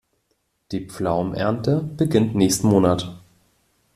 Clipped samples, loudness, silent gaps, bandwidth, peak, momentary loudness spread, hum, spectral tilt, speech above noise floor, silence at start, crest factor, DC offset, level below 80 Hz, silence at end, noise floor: under 0.1%; -21 LUFS; none; 14 kHz; -4 dBFS; 14 LU; none; -6 dB/octave; 50 dB; 0.7 s; 18 dB; under 0.1%; -52 dBFS; 0.8 s; -70 dBFS